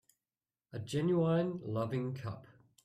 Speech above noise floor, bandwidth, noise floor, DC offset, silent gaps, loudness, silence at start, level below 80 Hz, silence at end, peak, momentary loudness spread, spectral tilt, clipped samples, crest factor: over 56 dB; 12.5 kHz; under -90 dBFS; under 0.1%; none; -35 LUFS; 0.75 s; -72 dBFS; 0.4 s; -22 dBFS; 16 LU; -7.5 dB/octave; under 0.1%; 14 dB